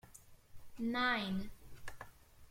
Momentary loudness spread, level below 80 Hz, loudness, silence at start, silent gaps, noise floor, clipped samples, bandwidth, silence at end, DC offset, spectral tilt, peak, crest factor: 25 LU; -60 dBFS; -37 LUFS; 0.05 s; none; -60 dBFS; under 0.1%; 16.5 kHz; 0 s; under 0.1%; -4.5 dB/octave; -24 dBFS; 18 dB